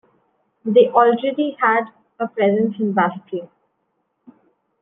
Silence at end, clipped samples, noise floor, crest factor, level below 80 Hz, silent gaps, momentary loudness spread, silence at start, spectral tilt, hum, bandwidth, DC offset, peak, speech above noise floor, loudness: 1.35 s; under 0.1%; -71 dBFS; 18 dB; -74 dBFS; none; 16 LU; 0.65 s; -9.5 dB/octave; none; 3.9 kHz; under 0.1%; -2 dBFS; 53 dB; -18 LUFS